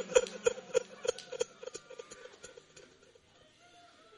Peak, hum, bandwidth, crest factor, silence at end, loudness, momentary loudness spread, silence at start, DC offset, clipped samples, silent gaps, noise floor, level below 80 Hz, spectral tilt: -10 dBFS; none; 11.5 kHz; 28 dB; 1.35 s; -36 LUFS; 25 LU; 0 s; under 0.1%; under 0.1%; none; -63 dBFS; -70 dBFS; -1.5 dB/octave